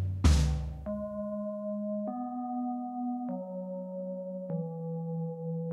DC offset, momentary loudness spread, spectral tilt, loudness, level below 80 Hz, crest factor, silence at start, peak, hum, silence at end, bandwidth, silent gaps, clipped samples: under 0.1%; 11 LU; -7 dB/octave; -34 LUFS; -38 dBFS; 20 dB; 0 s; -12 dBFS; none; 0 s; 12 kHz; none; under 0.1%